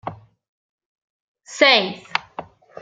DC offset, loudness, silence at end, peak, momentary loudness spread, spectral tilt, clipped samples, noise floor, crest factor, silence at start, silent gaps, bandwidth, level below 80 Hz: under 0.1%; -17 LUFS; 0.4 s; -2 dBFS; 24 LU; -2.5 dB/octave; under 0.1%; -38 dBFS; 22 dB; 0.05 s; 0.49-0.78 s, 0.86-0.96 s, 1.02-1.35 s; 9.2 kHz; -66 dBFS